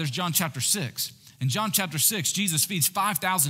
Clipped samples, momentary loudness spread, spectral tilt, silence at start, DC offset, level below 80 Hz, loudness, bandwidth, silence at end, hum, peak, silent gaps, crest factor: under 0.1%; 9 LU; -2.5 dB/octave; 0 s; under 0.1%; -72 dBFS; -24 LUFS; 16.5 kHz; 0 s; none; -6 dBFS; none; 20 dB